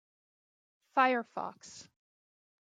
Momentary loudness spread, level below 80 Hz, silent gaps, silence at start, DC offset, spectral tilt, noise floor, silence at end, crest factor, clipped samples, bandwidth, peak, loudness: 22 LU; -90 dBFS; none; 0.95 s; under 0.1%; -3.5 dB/octave; under -90 dBFS; 0.9 s; 24 dB; under 0.1%; 9.2 kHz; -14 dBFS; -32 LUFS